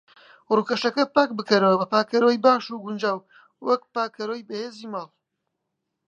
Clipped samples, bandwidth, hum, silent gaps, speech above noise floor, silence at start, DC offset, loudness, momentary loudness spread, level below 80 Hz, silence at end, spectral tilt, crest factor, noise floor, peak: under 0.1%; 8.4 kHz; none; none; 57 dB; 0.5 s; under 0.1%; -23 LUFS; 14 LU; -74 dBFS; 1 s; -5.5 dB/octave; 22 dB; -80 dBFS; -2 dBFS